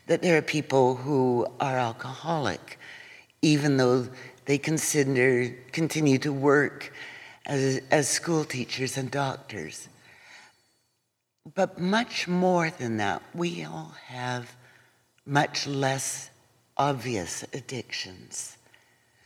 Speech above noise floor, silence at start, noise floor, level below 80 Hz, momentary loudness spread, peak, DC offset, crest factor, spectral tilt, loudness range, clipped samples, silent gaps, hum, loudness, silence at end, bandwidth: 51 dB; 0.1 s; -78 dBFS; -70 dBFS; 16 LU; -6 dBFS; under 0.1%; 20 dB; -4.5 dB/octave; 7 LU; under 0.1%; none; none; -27 LUFS; 0.7 s; 17 kHz